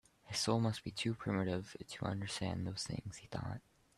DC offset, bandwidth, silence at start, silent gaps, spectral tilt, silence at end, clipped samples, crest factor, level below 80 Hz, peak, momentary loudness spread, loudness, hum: under 0.1%; 13 kHz; 0.25 s; none; -5 dB/octave; 0.35 s; under 0.1%; 20 dB; -66 dBFS; -20 dBFS; 11 LU; -40 LUFS; none